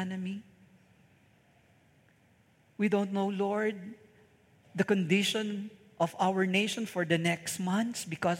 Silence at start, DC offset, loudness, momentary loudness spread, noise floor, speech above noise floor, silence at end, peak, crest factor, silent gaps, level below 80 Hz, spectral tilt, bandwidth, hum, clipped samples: 0 s; under 0.1%; -31 LUFS; 13 LU; -65 dBFS; 35 dB; 0 s; -12 dBFS; 20 dB; none; -78 dBFS; -5 dB/octave; 16.5 kHz; none; under 0.1%